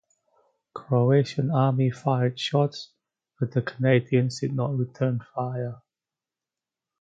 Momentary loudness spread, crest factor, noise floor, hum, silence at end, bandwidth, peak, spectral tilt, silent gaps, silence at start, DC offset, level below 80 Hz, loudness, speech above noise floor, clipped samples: 12 LU; 18 dB; under -90 dBFS; none; 1.25 s; 7.8 kHz; -8 dBFS; -7.5 dB/octave; none; 0.75 s; under 0.1%; -66 dBFS; -25 LUFS; over 66 dB; under 0.1%